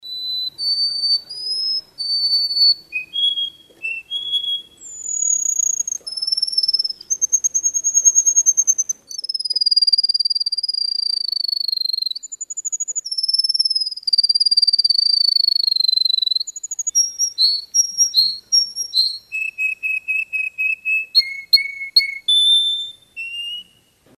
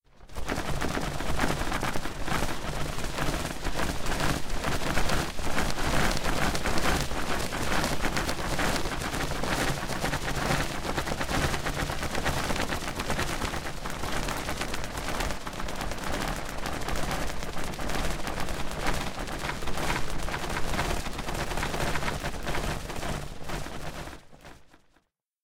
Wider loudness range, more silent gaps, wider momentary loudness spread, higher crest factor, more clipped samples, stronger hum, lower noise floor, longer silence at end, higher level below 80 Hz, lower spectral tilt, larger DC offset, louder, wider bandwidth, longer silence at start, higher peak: about the same, 5 LU vs 4 LU; neither; first, 11 LU vs 7 LU; about the same, 18 dB vs 20 dB; neither; neither; second, -54 dBFS vs -70 dBFS; about the same, 0.55 s vs 0.65 s; second, -70 dBFS vs -36 dBFS; second, 5.5 dB/octave vs -4 dB/octave; neither; first, -16 LUFS vs -31 LUFS; second, 14.5 kHz vs 16.5 kHz; second, 0.05 s vs 0.2 s; first, -2 dBFS vs -8 dBFS